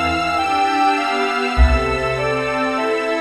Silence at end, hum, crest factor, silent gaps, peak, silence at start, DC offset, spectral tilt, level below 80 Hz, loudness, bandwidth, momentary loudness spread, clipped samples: 0 s; none; 16 dB; none; -2 dBFS; 0 s; under 0.1%; -5.5 dB/octave; -24 dBFS; -18 LUFS; 12.5 kHz; 3 LU; under 0.1%